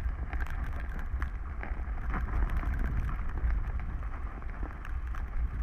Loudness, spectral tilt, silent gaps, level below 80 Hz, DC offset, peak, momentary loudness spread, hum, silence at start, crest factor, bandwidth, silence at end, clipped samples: -37 LUFS; -8 dB/octave; none; -32 dBFS; under 0.1%; -16 dBFS; 6 LU; none; 0 s; 16 dB; 4 kHz; 0 s; under 0.1%